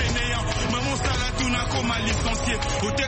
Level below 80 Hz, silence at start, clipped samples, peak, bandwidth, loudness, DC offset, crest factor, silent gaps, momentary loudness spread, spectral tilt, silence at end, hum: -30 dBFS; 0 s; under 0.1%; -12 dBFS; 8.8 kHz; -24 LUFS; under 0.1%; 12 dB; none; 1 LU; -4 dB/octave; 0 s; none